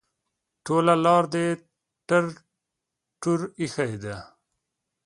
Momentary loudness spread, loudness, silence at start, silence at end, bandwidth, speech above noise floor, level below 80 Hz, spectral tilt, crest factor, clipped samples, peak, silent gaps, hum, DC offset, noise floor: 15 LU; -24 LUFS; 0.65 s; 0.8 s; 11.5 kHz; 61 dB; -64 dBFS; -6 dB/octave; 22 dB; under 0.1%; -4 dBFS; none; none; under 0.1%; -84 dBFS